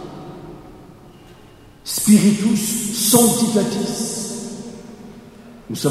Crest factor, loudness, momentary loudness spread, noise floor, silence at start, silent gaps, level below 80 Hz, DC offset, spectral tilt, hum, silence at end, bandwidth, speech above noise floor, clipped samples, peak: 20 dB; -17 LUFS; 24 LU; -44 dBFS; 0 s; none; -52 dBFS; under 0.1%; -4 dB/octave; none; 0 s; 15.5 kHz; 28 dB; under 0.1%; 0 dBFS